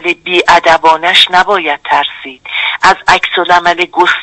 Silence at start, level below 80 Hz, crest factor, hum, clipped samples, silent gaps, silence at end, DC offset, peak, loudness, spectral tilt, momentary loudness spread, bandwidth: 0 s; -42 dBFS; 10 dB; none; 0.6%; none; 0 s; under 0.1%; 0 dBFS; -8 LUFS; -2 dB/octave; 8 LU; 11 kHz